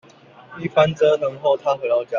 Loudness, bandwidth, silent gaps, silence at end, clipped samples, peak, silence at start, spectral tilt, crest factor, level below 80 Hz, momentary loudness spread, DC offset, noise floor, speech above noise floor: -19 LUFS; 7.4 kHz; none; 0 s; under 0.1%; -4 dBFS; 0.5 s; -6 dB/octave; 16 dB; -60 dBFS; 5 LU; under 0.1%; -46 dBFS; 27 dB